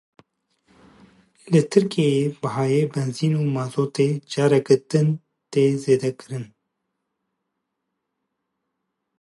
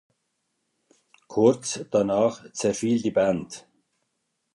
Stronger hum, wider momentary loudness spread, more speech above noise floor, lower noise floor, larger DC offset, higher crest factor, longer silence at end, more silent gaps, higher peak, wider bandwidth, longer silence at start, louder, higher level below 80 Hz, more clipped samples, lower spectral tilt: neither; about the same, 9 LU vs 10 LU; first, 59 dB vs 54 dB; about the same, -79 dBFS vs -77 dBFS; neither; about the same, 20 dB vs 20 dB; first, 2.75 s vs 0.95 s; neither; first, -2 dBFS vs -6 dBFS; about the same, 11.5 kHz vs 11.5 kHz; first, 1.45 s vs 1.3 s; first, -21 LUFS vs -24 LUFS; second, -70 dBFS vs -62 dBFS; neither; first, -7 dB/octave vs -5 dB/octave